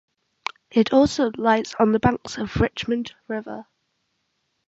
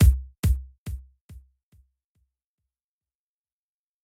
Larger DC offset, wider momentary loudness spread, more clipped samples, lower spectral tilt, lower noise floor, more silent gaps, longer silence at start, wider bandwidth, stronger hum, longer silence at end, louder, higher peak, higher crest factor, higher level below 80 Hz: neither; about the same, 15 LU vs 17 LU; neither; about the same, -6 dB/octave vs -6.5 dB/octave; second, -73 dBFS vs under -90 dBFS; second, none vs 0.39-0.43 s, 0.78-0.86 s, 1.21-1.29 s; first, 0.75 s vs 0 s; second, 8 kHz vs 16.5 kHz; neither; second, 1.05 s vs 2.65 s; first, -22 LUFS vs -27 LUFS; first, -4 dBFS vs -8 dBFS; about the same, 20 dB vs 20 dB; second, -44 dBFS vs -30 dBFS